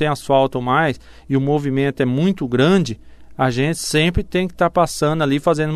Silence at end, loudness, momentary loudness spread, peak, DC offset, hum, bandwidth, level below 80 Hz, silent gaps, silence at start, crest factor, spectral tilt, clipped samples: 0 s; -18 LUFS; 6 LU; -2 dBFS; under 0.1%; none; 14 kHz; -40 dBFS; none; 0 s; 16 dB; -6 dB/octave; under 0.1%